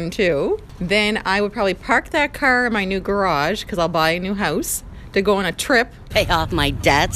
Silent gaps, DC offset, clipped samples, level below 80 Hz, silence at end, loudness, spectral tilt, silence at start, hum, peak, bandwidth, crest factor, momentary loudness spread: none; under 0.1%; under 0.1%; -36 dBFS; 0 s; -19 LUFS; -4 dB/octave; 0 s; none; 0 dBFS; 15.5 kHz; 18 dB; 5 LU